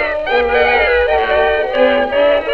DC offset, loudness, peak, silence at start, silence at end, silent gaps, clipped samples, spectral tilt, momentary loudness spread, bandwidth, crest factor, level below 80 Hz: under 0.1%; -13 LUFS; -2 dBFS; 0 s; 0 s; none; under 0.1%; -5.5 dB/octave; 3 LU; 5.8 kHz; 12 dB; -34 dBFS